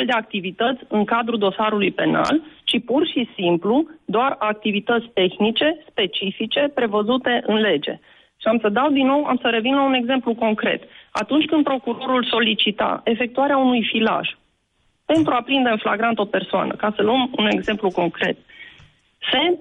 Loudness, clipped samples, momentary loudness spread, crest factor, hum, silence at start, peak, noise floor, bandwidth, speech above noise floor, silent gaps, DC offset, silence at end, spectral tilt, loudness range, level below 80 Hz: -20 LUFS; under 0.1%; 5 LU; 12 dB; none; 0 s; -8 dBFS; -65 dBFS; 10.5 kHz; 46 dB; none; under 0.1%; 0 s; -6 dB/octave; 1 LU; -60 dBFS